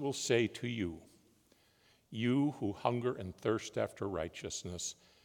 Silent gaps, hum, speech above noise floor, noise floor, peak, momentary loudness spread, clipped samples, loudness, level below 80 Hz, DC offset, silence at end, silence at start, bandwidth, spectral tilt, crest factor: none; none; 33 dB; -69 dBFS; -16 dBFS; 9 LU; under 0.1%; -36 LUFS; -70 dBFS; under 0.1%; 0.3 s; 0 s; 18 kHz; -5 dB/octave; 22 dB